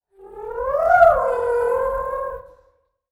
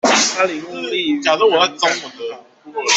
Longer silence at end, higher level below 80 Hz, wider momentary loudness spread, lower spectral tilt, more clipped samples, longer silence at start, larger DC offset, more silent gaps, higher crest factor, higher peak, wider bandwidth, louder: first, 0.7 s vs 0 s; first, -44 dBFS vs -64 dBFS; first, 19 LU vs 16 LU; first, -5.5 dB/octave vs -1 dB/octave; neither; first, 0.2 s vs 0.05 s; neither; neither; about the same, 20 dB vs 16 dB; about the same, 0 dBFS vs -2 dBFS; first, 12.5 kHz vs 8.4 kHz; second, -19 LUFS vs -16 LUFS